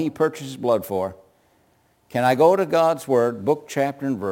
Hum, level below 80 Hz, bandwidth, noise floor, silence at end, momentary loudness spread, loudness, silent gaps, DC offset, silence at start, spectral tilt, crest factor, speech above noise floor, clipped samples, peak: none; -64 dBFS; 17 kHz; -62 dBFS; 0 s; 10 LU; -21 LUFS; none; under 0.1%; 0 s; -6 dB/octave; 18 dB; 41 dB; under 0.1%; -4 dBFS